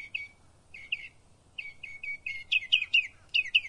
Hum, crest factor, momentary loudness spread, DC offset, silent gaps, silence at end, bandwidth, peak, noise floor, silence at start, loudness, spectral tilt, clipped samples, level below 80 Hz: none; 22 dB; 20 LU; under 0.1%; none; 0 s; 11.5 kHz; -10 dBFS; -60 dBFS; 0 s; -28 LUFS; 1 dB/octave; under 0.1%; -66 dBFS